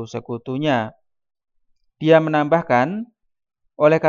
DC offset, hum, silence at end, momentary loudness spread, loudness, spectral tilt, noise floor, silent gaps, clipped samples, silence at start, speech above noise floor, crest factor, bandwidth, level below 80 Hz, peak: under 0.1%; none; 0 s; 15 LU; -19 LUFS; -7.5 dB/octave; -64 dBFS; none; under 0.1%; 0 s; 46 dB; 20 dB; 7.2 kHz; -66 dBFS; 0 dBFS